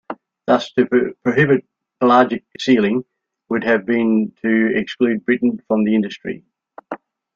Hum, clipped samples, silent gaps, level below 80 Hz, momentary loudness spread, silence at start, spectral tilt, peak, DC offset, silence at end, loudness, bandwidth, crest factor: none; under 0.1%; none; -60 dBFS; 15 LU; 0.1 s; -7 dB/octave; -2 dBFS; under 0.1%; 0.4 s; -17 LUFS; 7.2 kHz; 16 dB